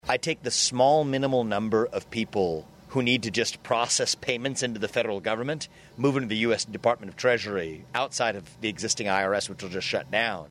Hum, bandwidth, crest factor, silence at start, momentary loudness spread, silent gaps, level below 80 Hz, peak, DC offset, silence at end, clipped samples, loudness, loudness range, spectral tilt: none; 15 kHz; 18 dB; 0.05 s; 8 LU; none; -60 dBFS; -8 dBFS; under 0.1%; 0.05 s; under 0.1%; -26 LUFS; 2 LU; -3.5 dB/octave